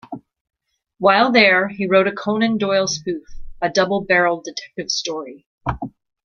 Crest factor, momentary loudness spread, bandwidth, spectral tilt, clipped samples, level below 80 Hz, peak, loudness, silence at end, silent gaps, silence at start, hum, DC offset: 20 dB; 17 LU; 7.4 kHz; -4 dB/octave; under 0.1%; -44 dBFS; 0 dBFS; -18 LUFS; 0.35 s; 0.41-0.45 s, 5.46-5.58 s; 0.1 s; none; under 0.1%